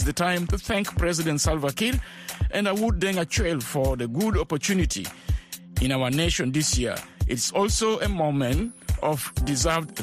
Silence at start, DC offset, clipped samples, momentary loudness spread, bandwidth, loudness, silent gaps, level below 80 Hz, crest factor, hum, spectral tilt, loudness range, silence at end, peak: 0 s; under 0.1%; under 0.1%; 7 LU; 15.5 kHz; -25 LUFS; none; -32 dBFS; 16 dB; none; -4.5 dB/octave; 1 LU; 0 s; -10 dBFS